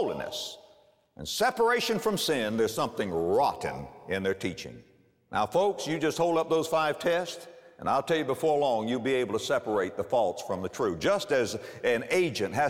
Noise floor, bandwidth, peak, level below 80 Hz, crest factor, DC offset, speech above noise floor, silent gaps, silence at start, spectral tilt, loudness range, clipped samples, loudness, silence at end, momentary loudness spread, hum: -61 dBFS; 16.5 kHz; -14 dBFS; -62 dBFS; 14 dB; under 0.1%; 33 dB; none; 0 s; -4 dB/octave; 2 LU; under 0.1%; -28 LUFS; 0 s; 10 LU; none